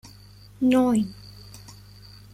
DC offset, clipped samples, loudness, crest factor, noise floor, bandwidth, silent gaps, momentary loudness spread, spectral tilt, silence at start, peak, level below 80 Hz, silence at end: under 0.1%; under 0.1%; -23 LUFS; 18 dB; -48 dBFS; 15 kHz; none; 24 LU; -6 dB/octave; 0.6 s; -8 dBFS; -54 dBFS; 0.6 s